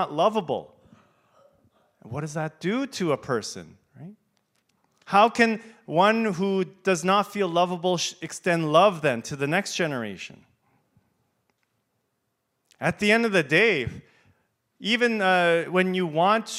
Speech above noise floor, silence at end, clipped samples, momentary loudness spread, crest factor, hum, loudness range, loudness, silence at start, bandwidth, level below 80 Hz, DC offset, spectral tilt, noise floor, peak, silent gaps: 53 dB; 0 s; under 0.1%; 13 LU; 22 dB; none; 9 LU; -23 LUFS; 0 s; 15.5 kHz; -66 dBFS; under 0.1%; -4.5 dB/octave; -77 dBFS; -4 dBFS; none